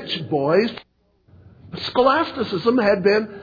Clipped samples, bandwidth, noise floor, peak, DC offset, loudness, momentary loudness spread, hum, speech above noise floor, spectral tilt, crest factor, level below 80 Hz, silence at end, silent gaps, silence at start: under 0.1%; 5 kHz; -55 dBFS; -4 dBFS; under 0.1%; -20 LUFS; 11 LU; none; 36 dB; -7 dB/octave; 16 dB; -56 dBFS; 0 s; none; 0 s